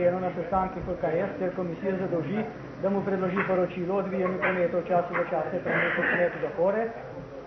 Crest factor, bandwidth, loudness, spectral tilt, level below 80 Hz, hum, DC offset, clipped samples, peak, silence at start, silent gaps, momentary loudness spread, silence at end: 14 dB; 6.2 kHz; -28 LUFS; -8.5 dB/octave; -54 dBFS; none; under 0.1%; under 0.1%; -12 dBFS; 0 s; none; 6 LU; 0 s